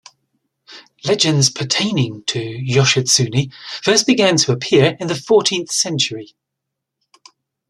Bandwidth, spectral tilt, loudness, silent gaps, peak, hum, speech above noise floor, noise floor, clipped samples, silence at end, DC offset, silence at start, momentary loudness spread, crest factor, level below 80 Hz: 13 kHz; -3.5 dB/octave; -16 LUFS; none; 0 dBFS; none; 63 dB; -79 dBFS; under 0.1%; 1.45 s; under 0.1%; 0.7 s; 9 LU; 18 dB; -56 dBFS